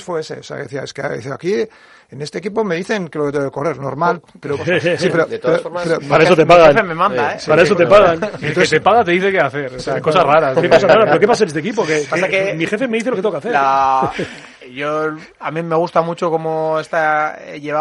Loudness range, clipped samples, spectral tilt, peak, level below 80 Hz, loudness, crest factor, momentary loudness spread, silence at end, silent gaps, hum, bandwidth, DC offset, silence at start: 9 LU; under 0.1%; -5.5 dB/octave; 0 dBFS; -50 dBFS; -15 LUFS; 14 dB; 14 LU; 0 s; none; none; 11.5 kHz; under 0.1%; 0 s